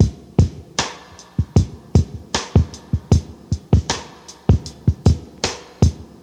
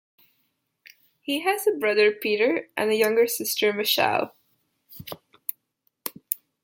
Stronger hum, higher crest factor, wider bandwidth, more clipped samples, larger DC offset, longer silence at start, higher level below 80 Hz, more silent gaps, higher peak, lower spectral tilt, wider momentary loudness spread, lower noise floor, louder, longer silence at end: neither; second, 18 dB vs 24 dB; second, 10 kHz vs 17 kHz; neither; neither; second, 0 s vs 1.3 s; first, -26 dBFS vs -76 dBFS; neither; about the same, 0 dBFS vs -2 dBFS; first, -6 dB/octave vs -2.5 dB/octave; second, 8 LU vs 16 LU; second, -39 dBFS vs -73 dBFS; first, -20 LUFS vs -23 LUFS; second, 0.15 s vs 0.3 s